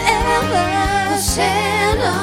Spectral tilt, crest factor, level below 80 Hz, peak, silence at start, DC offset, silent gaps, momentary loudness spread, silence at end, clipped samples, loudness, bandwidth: -3.5 dB/octave; 16 dB; -30 dBFS; 0 dBFS; 0 s; under 0.1%; none; 1 LU; 0 s; under 0.1%; -16 LUFS; over 20 kHz